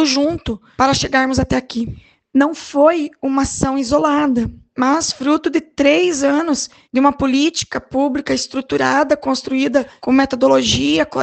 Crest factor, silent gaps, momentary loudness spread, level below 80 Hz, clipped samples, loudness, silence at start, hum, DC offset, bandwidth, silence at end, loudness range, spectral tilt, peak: 16 dB; none; 7 LU; -40 dBFS; under 0.1%; -16 LUFS; 0 s; none; under 0.1%; 9 kHz; 0 s; 1 LU; -4 dB/octave; 0 dBFS